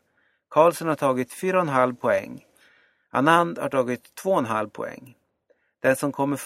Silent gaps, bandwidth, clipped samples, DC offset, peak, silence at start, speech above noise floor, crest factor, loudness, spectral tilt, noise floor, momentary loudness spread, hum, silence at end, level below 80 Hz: none; 16 kHz; under 0.1%; under 0.1%; -2 dBFS; 0.5 s; 45 dB; 22 dB; -23 LUFS; -5.5 dB/octave; -68 dBFS; 10 LU; none; 0 s; -68 dBFS